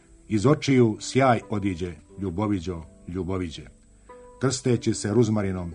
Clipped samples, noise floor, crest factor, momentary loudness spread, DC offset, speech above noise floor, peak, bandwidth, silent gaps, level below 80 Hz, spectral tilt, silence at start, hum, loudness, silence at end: under 0.1%; -49 dBFS; 18 dB; 14 LU; under 0.1%; 25 dB; -6 dBFS; 10.5 kHz; none; -50 dBFS; -6 dB/octave; 0.3 s; none; -25 LUFS; 0 s